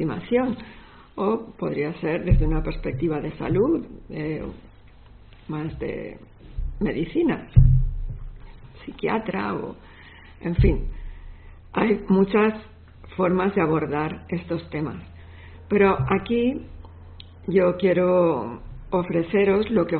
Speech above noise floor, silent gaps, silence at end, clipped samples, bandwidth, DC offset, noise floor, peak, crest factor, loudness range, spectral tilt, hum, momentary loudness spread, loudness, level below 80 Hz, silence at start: 25 dB; none; 0 s; under 0.1%; 4.4 kHz; under 0.1%; -47 dBFS; -2 dBFS; 22 dB; 5 LU; -7 dB/octave; none; 21 LU; -23 LUFS; -32 dBFS; 0 s